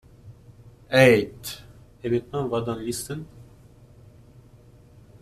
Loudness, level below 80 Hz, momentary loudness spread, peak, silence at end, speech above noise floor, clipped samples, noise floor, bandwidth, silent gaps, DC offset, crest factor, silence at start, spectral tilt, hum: -23 LUFS; -54 dBFS; 20 LU; -2 dBFS; 1.85 s; 29 dB; under 0.1%; -51 dBFS; 14.5 kHz; none; under 0.1%; 24 dB; 0.25 s; -5.5 dB/octave; none